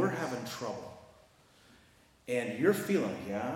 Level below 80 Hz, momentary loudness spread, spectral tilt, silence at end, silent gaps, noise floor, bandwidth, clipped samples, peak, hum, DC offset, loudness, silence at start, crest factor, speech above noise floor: -72 dBFS; 19 LU; -5.5 dB/octave; 0 s; none; -63 dBFS; 16.5 kHz; under 0.1%; -14 dBFS; none; under 0.1%; -33 LUFS; 0 s; 20 dB; 31 dB